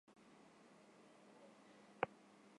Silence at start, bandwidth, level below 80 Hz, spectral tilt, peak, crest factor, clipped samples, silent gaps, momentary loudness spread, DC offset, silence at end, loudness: 0.05 s; 11 kHz; under -90 dBFS; -5 dB/octave; -18 dBFS; 36 dB; under 0.1%; none; 19 LU; under 0.1%; 0 s; -47 LUFS